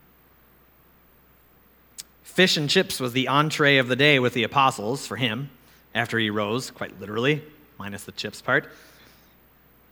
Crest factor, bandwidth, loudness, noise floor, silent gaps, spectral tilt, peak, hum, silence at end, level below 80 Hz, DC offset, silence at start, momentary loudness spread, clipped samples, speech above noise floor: 22 dB; 20 kHz; -22 LUFS; -57 dBFS; none; -4 dB/octave; -2 dBFS; none; 1.15 s; -64 dBFS; under 0.1%; 2 s; 18 LU; under 0.1%; 34 dB